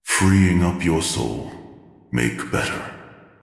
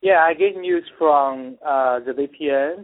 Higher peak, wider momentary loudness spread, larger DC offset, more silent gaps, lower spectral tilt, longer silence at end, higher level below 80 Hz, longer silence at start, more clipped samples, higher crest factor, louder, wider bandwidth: about the same, -4 dBFS vs -4 dBFS; first, 20 LU vs 9 LU; neither; neither; second, -5 dB/octave vs -9 dB/octave; first, 0.3 s vs 0 s; first, -44 dBFS vs -66 dBFS; about the same, 0.05 s vs 0.05 s; neither; about the same, 18 dB vs 16 dB; about the same, -20 LUFS vs -20 LUFS; first, 12 kHz vs 4.1 kHz